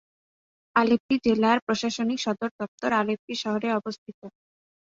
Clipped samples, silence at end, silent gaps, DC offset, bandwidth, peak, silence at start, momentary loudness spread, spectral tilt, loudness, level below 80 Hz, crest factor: under 0.1%; 0.55 s; 1.00-1.09 s, 1.62-1.67 s, 2.51-2.59 s, 2.68-2.78 s, 3.19-3.28 s, 3.98-4.06 s, 4.14-4.22 s; under 0.1%; 7.8 kHz; -6 dBFS; 0.75 s; 9 LU; -4.5 dB/octave; -25 LUFS; -64 dBFS; 20 dB